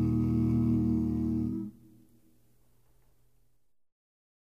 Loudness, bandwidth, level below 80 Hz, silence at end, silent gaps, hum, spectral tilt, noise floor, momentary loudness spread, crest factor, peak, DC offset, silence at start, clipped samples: -29 LUFS; 5.6 kHz; -46 dBFS; 2.85 s; none; none; -11 dB/octave; -75 dBFS; 9 LU; 14 dB; -18 dBFS; under 0.1%; 0 s; under 0.1%